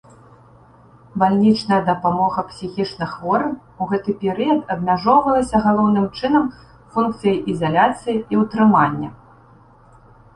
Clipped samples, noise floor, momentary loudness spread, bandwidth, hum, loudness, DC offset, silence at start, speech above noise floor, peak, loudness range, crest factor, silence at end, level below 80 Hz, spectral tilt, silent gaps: under 0.1%; -48 dBFS; 11 LU; 9.8 kHz; none; -18 LUFS; under 0.1%; 1.15 s; 31 dB; -2 dBFS; 2 LU; 16 dB; 1.2 s; -50 dBFS; -7 dB/octave; none